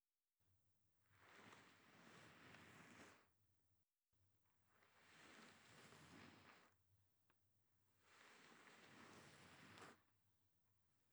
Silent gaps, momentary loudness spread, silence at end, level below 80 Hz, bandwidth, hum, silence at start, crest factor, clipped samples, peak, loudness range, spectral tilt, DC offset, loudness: none; 4 LU; 0 s; under -90 dBFS; over 20 kHz; none; 0.4 s; 26 dB; under 0.1%; -44 dBFS; 2 LU; -3.5 dB/octave; under 0.1%; -66 LUFS